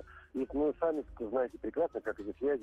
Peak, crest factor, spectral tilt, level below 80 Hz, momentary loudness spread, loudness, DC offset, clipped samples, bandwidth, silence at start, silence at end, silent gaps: -20 dBFS; 14 dB; -8 dB/octave; -58 dBFS; 8 LU; -35 LUFS; under 0.1%; under 0.1%; 7.4 kHz; 0 s; 0 s; none